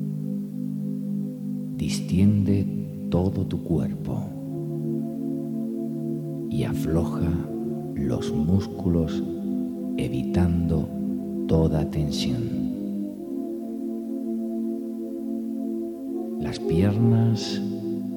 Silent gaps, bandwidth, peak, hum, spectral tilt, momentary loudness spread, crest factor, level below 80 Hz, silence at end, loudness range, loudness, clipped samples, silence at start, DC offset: none; 18.5 kHz; -8 dBFS; none; -7.5 dB/octave; 9 LU; 18 dB; -44 dBFS; 0 s; 4 LU; -26 LUFS; under 0.1%; 0 s; under 0.1%